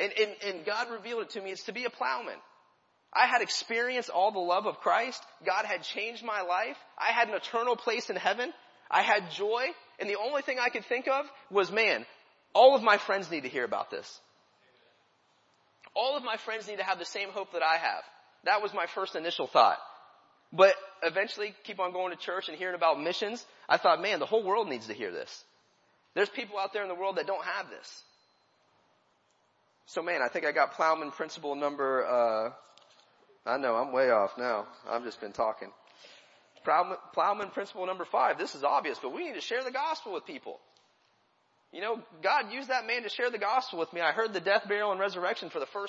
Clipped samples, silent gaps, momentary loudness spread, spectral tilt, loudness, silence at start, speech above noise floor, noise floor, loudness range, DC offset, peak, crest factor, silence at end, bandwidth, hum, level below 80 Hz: under 0.1%; none; 12 LU; -3 dB/octave; -30 LUFS; 0 s; 40 dB; -71 dBFS; 7 LU; under 0.1%; -8 dBFS; 24 dB; 0 s; 8 kHz; none; -86 dBFS